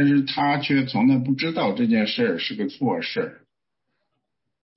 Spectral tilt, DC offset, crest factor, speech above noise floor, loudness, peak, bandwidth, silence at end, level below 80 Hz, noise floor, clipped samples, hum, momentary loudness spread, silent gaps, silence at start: -9.5 dB/octave; under 0.1%; 14 dB; 59 dB; -22 LUFS; -10 dBFS; 5.8 kHz; 1.4 s; -66 dBFS; -80 dBFS; under 0.1%; none; 7 LU; none; 0 s